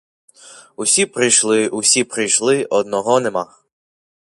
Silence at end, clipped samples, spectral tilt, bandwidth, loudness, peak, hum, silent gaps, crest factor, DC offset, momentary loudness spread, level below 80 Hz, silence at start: 0.85 s; under 0.1%; -2 dB/octave; 11.5 kHz; -15 LUFS; 0 dBFS; none; none; 18 dB; under 0.1%; 9 LU; -66 dBFS; 0.5 s